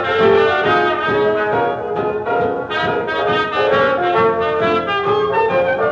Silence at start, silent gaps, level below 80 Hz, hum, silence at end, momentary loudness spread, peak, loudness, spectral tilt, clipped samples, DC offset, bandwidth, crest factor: 0 s; none; -48 dBFS; none; 0 s; 6 LU; -2 dBFS; -16 LUFS; -6.5 dB/octave; under 0.1%; under 0.1%; 7.2 kHz; 14 dB